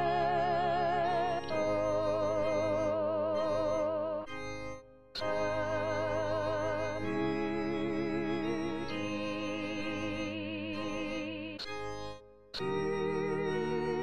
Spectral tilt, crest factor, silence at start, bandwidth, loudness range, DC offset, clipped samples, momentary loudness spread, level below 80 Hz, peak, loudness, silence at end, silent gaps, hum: -6 dB/octave; 14 dB; 0 s; 10 kHz; 6 LU; 0.4%; under 0.1%; 9 LU; -58 dBFS; -20 dBFS; -34 LUFS; 0 s; none; none